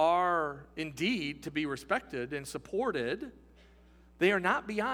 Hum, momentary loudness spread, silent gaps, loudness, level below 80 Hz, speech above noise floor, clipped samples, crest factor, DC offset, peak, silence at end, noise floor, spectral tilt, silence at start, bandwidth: none; 11 LU; none; -32 LUFS; -60 dBFS; 26 dB; under 0.1%; 20 dB; under 0.1%; -12 dBFS; 0 s; -59 dBFS; -5 dB/octave; 0 s; 19 kHz